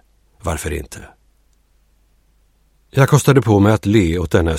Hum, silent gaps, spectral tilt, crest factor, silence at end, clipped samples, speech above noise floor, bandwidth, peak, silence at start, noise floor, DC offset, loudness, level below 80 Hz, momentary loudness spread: none; none; -6.5 dB/octave; 16 dB; 0 s; under 0.1%; 42 dB; 16 kHz; 0 dBFS; 0.45 s; -57 dBFS; under 0.1%; -15 LUFS; -34 dBFS; 16 LU